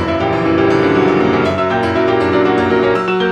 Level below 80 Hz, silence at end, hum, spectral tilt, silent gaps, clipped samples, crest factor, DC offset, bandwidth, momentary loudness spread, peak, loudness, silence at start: -40 dBFS; 0 s; none; -7 dB/octave; none; under 0.1%; 12 dB; under 0.1%; 8.8 kHz; 3 LU; -2 dBFS; -13 LUFS; 0 s